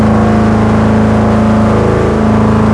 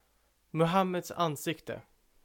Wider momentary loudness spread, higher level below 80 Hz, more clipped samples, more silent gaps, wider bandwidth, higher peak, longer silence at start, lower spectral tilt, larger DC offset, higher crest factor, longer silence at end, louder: second, 1 LU vs 14 LU; first, -22 dBFS vs -66 dBFS; first, 0.3% vs under 0.1%; neither; second, 11 kHz vs 18 kHz; first, 0 dBFS vs -14 dBFS; second, 0 s vs 0.55 s; first, -8 dB/octave vs -5.5 dB/octave; neither; second, 8 dB vs 20 dB; second, 0 s vs 0.45 s; first, -9 LUFS vs -31 LUFS